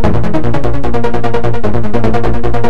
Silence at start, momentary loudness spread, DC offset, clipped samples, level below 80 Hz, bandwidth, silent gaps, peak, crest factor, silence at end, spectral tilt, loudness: 0 s; 2 LU; 50%; under 0.1%; -22 dBFS; 9.6 kHz; none; 0 dBFS; 16 dB; 0 s; -8 dB/octave; -16 LUFS